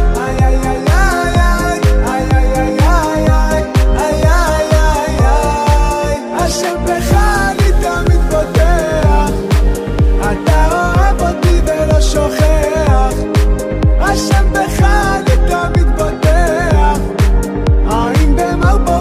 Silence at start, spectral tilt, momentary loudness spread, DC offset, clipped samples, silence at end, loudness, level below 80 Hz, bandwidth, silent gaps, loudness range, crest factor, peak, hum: 0 s; -6 dB/octave; 3 LU; under 0.1%; under 0.1%; 0 s; -13 LUFS; -14 dBFS; 15 kHz; none; 1 LU; 10 dB; 0 dBFS; none